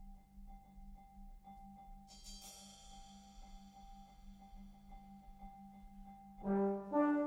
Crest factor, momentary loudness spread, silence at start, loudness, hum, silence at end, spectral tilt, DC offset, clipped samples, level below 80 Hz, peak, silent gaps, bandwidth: 20 dB; 23 LU; 0 s; -40 LUFS; none; 0 s; -6.5 dB/octave; under 0.1%; under 0.1%; -60 dBFS; -24 dBFS; none; 15.5 kHz